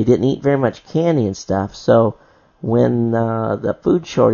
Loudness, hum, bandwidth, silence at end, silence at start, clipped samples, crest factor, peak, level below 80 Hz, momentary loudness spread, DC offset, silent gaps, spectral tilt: -17 LUFS; none; 7.2 kHz; 0 s; 0 s; under 0.1%; 16 dB; 0 dBFS; -50 dBFS; 6 LU; under 0.1%; none; -7.5 dB/octave